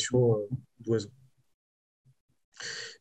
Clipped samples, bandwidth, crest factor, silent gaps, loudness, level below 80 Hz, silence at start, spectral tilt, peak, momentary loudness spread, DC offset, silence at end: under 0.1%; 9.2 kHz; 18 dB; 1.54-2.05 s, 2.20-2.28 s, 2.44-2.52 s; -31 LUFS; -70 dBFS; 0 s; -5.5 dB/octave; -14 dBFS; 15 LU; under 0.1%; 0.05 s